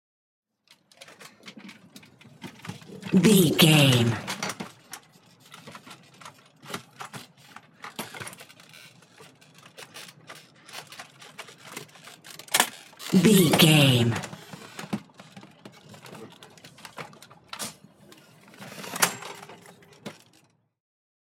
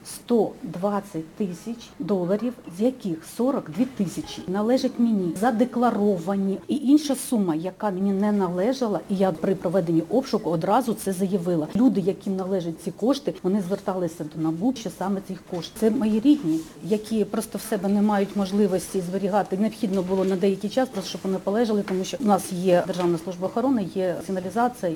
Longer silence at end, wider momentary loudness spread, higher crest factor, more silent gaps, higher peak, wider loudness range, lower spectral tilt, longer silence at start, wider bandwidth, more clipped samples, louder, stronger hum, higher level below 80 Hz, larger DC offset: first, 1.1 s vs 0 s; first, 28 LU vs 7 LU; first, 24 dB vs 18 dB; neither; about the same, -4 dBFS vs -6 dBFS; first, 21 LU vs 4 LU; second, -4.5 dB/octave vs -6.5 dB/octave; first, 1.45 s vs 0 s; second, 16.5 kHz vs 19 kHz; neither; about the same, -22 LUFS vs -24 LUFS; neither; second, -68 dBFS vs -58 dBFS; neither